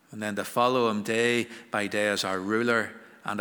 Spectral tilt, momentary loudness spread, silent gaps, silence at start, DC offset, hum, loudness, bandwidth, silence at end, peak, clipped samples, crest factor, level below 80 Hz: -4 dB/octave; 9 LU; none; 0.1 s; under 0.1%; none; -27 LUFS; over 20 kHz; 0 s; -10 dBFS; under 0.1%; 18 dB; -76 dBFS